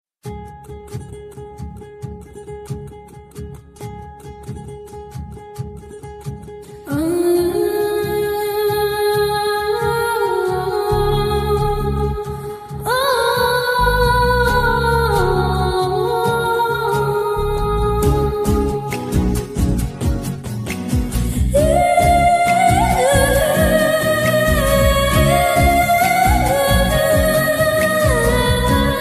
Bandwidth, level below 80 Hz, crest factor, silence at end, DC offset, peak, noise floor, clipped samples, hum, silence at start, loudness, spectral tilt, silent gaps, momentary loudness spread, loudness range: 15.5 kHz; -26 dBFS; 16 dB; 0 s; under 0.1%; -2 dBFS; -37 dBFS; under 0.1%; none; 0.25 s; -16 LUFS; -5 dB/octave; none; 20 LU; 19 LU